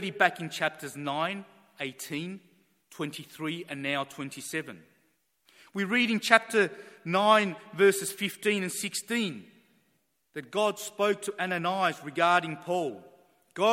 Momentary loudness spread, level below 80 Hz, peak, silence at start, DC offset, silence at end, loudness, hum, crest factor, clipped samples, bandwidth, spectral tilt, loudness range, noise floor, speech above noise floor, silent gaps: 15 LU; -80 dBFS; -2 dBFS; 0 s; under 0.1%; 0 s; -28 LUFS; none; 28 dB; under 0.1%; 16.5 kHz; -3.5 dB/octave; 10 LU; -74 dBFS; 45 dB; none